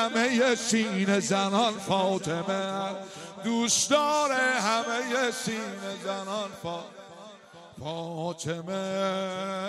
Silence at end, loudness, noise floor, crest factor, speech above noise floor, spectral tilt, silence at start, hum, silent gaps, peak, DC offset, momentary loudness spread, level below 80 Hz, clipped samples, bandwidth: 0 s; -27 LUFS; -49 dBFS; 18 dB; 21 dB; -3 dB/octave; 0 s; none; none; -10 dBFS; under 0.1%; 14 LU; -72 dBFS; under 0.1%; 14.5 kHz